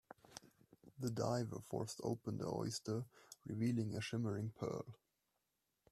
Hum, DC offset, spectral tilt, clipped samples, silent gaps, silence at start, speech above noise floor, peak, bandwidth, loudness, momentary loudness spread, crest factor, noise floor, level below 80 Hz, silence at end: none; under 0.1%; -6 dB/octave; under 0.1%; none; 0.3 s; 45 dB; -26 dBFS; 14 kHz; -43 LUFS; 16 LU; 20 dB; -87 dBFS; -74 dBFS; 0.95 s